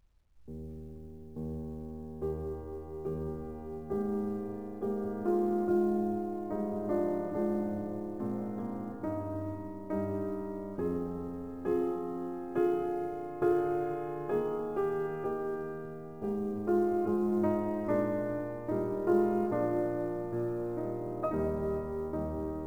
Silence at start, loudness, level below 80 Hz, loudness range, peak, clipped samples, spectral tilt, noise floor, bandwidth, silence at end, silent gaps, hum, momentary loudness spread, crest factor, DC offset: 0 s; -34 LUFS; -54 dBFS; 6 LU; -16 dBFS; under 0.1%; -9.5 dB/octave; -56 dBFS; 3.6 kHz; 0 s; none; none; 11 LU; 18 dB; 0.2%